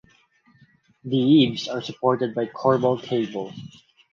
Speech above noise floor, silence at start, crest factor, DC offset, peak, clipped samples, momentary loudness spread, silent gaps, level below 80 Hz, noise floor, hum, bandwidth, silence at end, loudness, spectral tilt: 38 dB; 1.05 s; 20 dB; under 0.1%; -4 dBFS; under 0.1%; 16 LU; none; -64 dBFS; -59 dBFS; none; 7.2 kHz; 0.45 s; -22 LUFS; -7 dB/octave